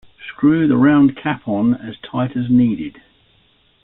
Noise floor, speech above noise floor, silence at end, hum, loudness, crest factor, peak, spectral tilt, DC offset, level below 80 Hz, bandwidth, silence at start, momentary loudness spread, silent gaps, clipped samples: -57 dBFS; 41 dB; 0.95 s; none; -16 LUFS; 14 dB; -2 dBFS; -12 dB/octave; under 0.1%; -52 dBFS; 4 kHz; 0.2 s; 14 LU; none; under 0.1%